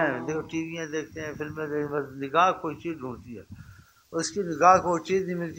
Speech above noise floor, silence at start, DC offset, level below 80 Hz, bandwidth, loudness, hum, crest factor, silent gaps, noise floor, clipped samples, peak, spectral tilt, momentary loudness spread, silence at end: 25 dB; 0 s; under 0.1%; -60 dBFS; 16 kHz; -27 LUFS; none; 22 dB; none; -52 dBFS; under 0.1%; -4 dBFS; -5 dB/octave; 17 LU; 0 s